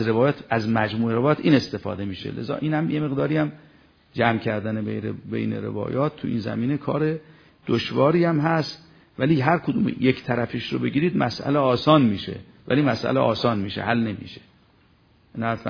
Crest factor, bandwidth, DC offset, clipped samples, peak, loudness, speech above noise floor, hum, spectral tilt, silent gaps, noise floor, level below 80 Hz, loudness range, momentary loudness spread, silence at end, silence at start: 20 dB; 5.4 kHz; under 0.1%; under 0.1%; -2 dBFS; -23 LUFS; 36 dB; none; -8 dB/octave; none; -58 dBFS; -56 dBFS; 4 LU; 11 LU; 0 s; 0 s